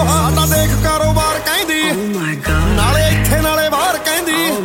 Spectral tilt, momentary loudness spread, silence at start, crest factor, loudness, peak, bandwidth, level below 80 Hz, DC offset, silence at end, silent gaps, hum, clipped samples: -4 dB/octave; 4 LU; 0 s; 14 dB; -14 LUFS; 0 dBFS; 16.5 kHz; -22 dBFS; under 0.1%; 0 s; none; none; under 0.1%